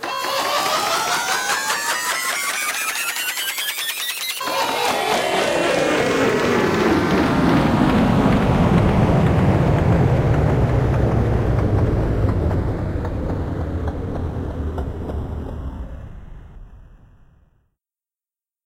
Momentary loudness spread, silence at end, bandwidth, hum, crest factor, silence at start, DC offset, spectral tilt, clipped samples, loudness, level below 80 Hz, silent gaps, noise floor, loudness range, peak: 10 LU; 1.8 s; 16.5 kHz; none; 16 dB; 0 s; under 0.1%; -5 dB/octave; under 0.1%; -19 LUFS; -30 dBFS; none; under -90 dBFS; 13 LU; -4 dBFS